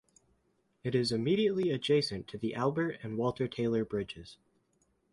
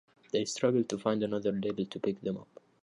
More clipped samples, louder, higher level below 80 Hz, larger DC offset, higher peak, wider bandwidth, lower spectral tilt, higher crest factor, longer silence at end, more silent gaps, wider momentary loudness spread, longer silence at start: neither; about the same, -32 LUFS vs -33 LUFS; first, -64 dBFS vs -70 dBFS; neither; about the same, -16 dBFS vs -14 dBFS; about the same, 11.5 kHz vs 11 kHz; about the same, -6.5 dB/octave vs -5.5 dB/octave; about the same, 16 dB vs 18 dB; first, 0.8 s vs 0.4 s; neither; about the same, 9 LU vs 8 LU; first, 0.85 s vs 0.35 s